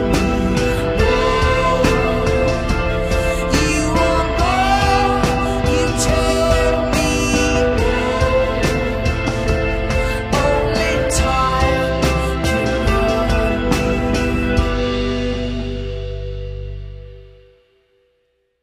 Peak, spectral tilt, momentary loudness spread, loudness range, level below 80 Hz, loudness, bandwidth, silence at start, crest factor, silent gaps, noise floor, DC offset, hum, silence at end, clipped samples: -2 dBFS; -5 dB/octave; 7 LU; 5 LU; -24 dBFS; -17 LUFS; 15.5 kHz; 0 s; 16 dB; none; -65 dBFS; under 0.1%; none; 1.35 s; under 0.1%